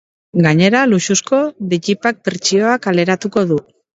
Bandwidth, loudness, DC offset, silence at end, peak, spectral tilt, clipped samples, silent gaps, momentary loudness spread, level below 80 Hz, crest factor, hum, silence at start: 8 kHz; -15 LUFS; under 0.1%; 0.35 s; 0 dBFS; -4.5 dB/octave; under 0.1%; none; 7 LU; -58 dBFS; 14 dB; none; 0.35 s